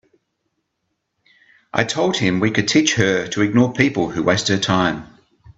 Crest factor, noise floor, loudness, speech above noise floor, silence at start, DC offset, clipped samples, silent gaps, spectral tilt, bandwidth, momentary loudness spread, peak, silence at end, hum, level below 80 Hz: 20 dB; -74 dBFS; -18 LUFS; 57 dB; 1.75 s; under 0.1%; under 0.1%; none; -4.5 dB/octave; 8.2 kHz; 6 LU; 0 dBFS; 0.05 s; none; -52 dBFS